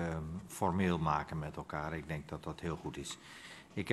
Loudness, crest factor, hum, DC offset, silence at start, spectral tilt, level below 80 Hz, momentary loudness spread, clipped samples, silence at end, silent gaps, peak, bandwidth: -39 LUFS; 22 dB; none; under 0.1%; 0 s; -6 dB/octave; -56 dBFS; 12 LU; under 0.1%; 0 s; none; -16 dBFS; 13 kHz